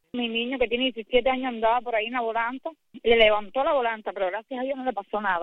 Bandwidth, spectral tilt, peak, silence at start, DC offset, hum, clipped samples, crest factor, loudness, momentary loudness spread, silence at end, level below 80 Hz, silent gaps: 4.3 kHz; -6 dB/octave; -4 dBFS; 0.15 s; under 0.1%; none; under 0.1%; 20 dB; -25 LUFS; 10 LU; 0 s; -50 dBFS; none